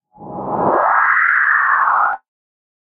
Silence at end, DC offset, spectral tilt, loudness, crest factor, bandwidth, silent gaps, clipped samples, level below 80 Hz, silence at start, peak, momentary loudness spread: 0.8 s; under 0.1%; -8.5 dB/octave; -14 LUFS; 14 dB; 4.9 kHz; none; under 0.1%; -56 dBFS; 0.2 s; -2 dBFS; 16 LU